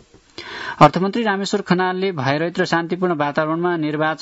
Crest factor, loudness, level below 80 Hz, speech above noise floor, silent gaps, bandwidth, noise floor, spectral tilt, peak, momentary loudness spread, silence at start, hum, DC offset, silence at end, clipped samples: 20 dB; -19 LUFS; -54 dBFS; 21 dB; none; 8 kHz; -39 dBFS; -6 dB/octave; 0 dBFS; 10 LU; 0.4 s; none; under 0.1%; 0 s; under 0.1%